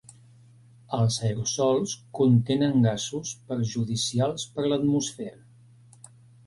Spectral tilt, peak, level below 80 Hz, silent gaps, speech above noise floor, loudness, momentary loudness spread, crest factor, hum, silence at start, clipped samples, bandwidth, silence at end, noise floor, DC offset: -5.5 dB/octave; -10 dBFS; -60 dBFS; none; 29 dB; -26 LUFS; 11 LU; 16 dB; none; 0.9 s; under 0.1%; 11.5 kHz; 1.15 s; -54 dBFS; under 0.1%